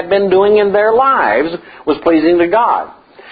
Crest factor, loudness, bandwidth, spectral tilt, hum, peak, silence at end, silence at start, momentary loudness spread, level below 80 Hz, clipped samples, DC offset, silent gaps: 12 dB; -12 LUFS; 5 kHz; -9.5 dB/octave; none; 0 dBFS; 0 s; 0 s; 9 LU; -48 dBFS; under 0.1%; under 0.1%; none